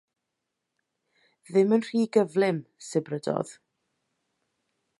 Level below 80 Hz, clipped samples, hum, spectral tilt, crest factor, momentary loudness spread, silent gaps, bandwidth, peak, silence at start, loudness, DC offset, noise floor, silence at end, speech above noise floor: -78 dBFS; under 0.1%; none; -6.5 dB/octave; 20 dB; 9 LU; none; 11.5 kHz; -8 dBFS; 1.5 s; -26 LUFS; under 0.1%; -83 dBFS; 1.5 s; 58 dB